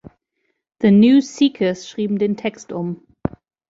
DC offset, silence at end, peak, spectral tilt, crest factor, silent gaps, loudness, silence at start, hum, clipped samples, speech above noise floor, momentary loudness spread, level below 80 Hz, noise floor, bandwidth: under 0.1%; 0.4 s; -2 dBFS; -6.5 dB/octave; 16 dB; none; -18 LUFS; 0.8 s; none; under 0.1%; 55 dB; 16 LU; -50 dBFS; -72 dBFS; 7.8 kHz